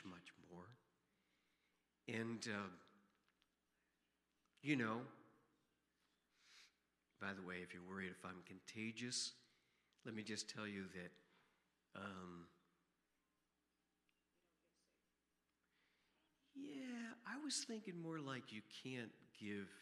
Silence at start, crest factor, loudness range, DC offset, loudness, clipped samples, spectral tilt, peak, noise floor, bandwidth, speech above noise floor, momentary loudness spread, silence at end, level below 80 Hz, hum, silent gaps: 0 s; 26 dB; 11 LU; under 0.1%; -50 LUFS; under 0.1%; -3.5 dB/octave; -26 dBFS; -89 dBFS; 13 kHz; 39 dB; 17 LU; 0 s; under -90 dBFS; none; none